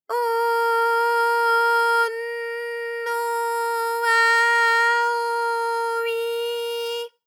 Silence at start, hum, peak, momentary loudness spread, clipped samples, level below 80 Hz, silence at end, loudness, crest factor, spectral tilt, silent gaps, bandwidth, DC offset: 0.1 s; none; -8 dBFS; 11 LU; under 0.1%; under -90 dBFS; 0.2 s; -21 LUFS; 14 dB; 4 dB/octave; none; 18.5 kHz; under 0.1%